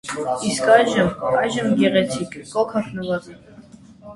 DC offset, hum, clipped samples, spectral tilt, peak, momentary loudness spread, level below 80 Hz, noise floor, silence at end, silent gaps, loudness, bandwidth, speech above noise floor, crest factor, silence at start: under 0.1%; none; under 0.1%; -5 dB/octave; 0 dBFS; 12 LU; -52 dBFS; -44 dBFS; 0 s; none; -20 LUFS; 11.5 kHz; 25 dB; 20 dB; 0.05 s